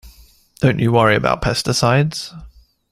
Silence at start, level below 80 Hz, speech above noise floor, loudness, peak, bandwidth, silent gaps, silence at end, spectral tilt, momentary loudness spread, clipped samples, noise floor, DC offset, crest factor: 0.05 s; -40 dBFS; 32 dB; -16 LUFS; 0 dBFS; 15 kHz; none; 0.45 s; -5.5 dB/octave; 9 LU; under 0.1%; -48 dBFS; under 0.1%; 18 dB